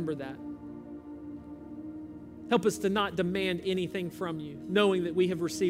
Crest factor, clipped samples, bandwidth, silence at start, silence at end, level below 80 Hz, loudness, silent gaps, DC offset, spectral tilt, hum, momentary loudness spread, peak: 18 dB; under 0.1%; 16 kHz; 0 s; 0 s; -62 dBFS; -30 LUFS; none; under 0.1%; -5.5 dB/octave; none; 17 LU; -12 dBFS